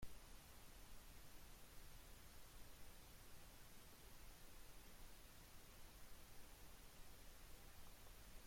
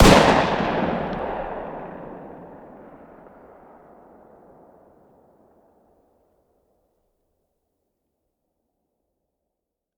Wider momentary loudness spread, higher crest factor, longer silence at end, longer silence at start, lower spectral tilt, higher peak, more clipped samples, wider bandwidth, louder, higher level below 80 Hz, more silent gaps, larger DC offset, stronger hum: second, 0 LU vs 29 LU; second, 18 dB vs 26 dB; second, 0 s vs 7.4 s; about the same, 0 s vs 0 s; second, -3 dB/octave vs -5 dB/octave; second, -42 dBFS vs 0 dBFS; neither; second, 16.5 kHz vs over 20 kHz; second, -64 LUFS vs -21 LUFS; second, -64 dBFS vs -36 dBFS; neither; neither; neither